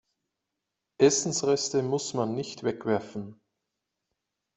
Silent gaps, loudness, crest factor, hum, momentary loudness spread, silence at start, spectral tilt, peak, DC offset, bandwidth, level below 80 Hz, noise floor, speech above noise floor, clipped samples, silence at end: none; -27 LUFS; 22 dB; none; 13 LU; 1 s; -4 dB/octave; -8 dBFS; under 0.1%; 8.2 kHz; -70 dBFS; -85 dBFS; 58 dB; under 0.1%; 1.25 s